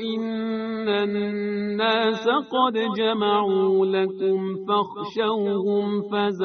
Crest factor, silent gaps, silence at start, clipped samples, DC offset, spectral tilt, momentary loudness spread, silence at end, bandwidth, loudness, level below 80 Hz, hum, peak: 16 dB; none; 0 s; under 0.1%; under 0.1%; -3.5 dB/octave; 6 LU; 0 s; 6.4 kHz; -23 LUFS; -70 dBFS; none; -6 dBFS